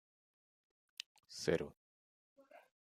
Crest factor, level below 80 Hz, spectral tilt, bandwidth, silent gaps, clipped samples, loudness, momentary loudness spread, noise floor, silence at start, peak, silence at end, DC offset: 28 dB; -76 dBFS; -4.5 dB/octave; 14.5 kHz; 1.77-2.36 s; under 0.1%; -42 LUFS; 14 LU; under -90 dBFS; 1.3 s; -20 dBFS; 0.35 s; under 0.1%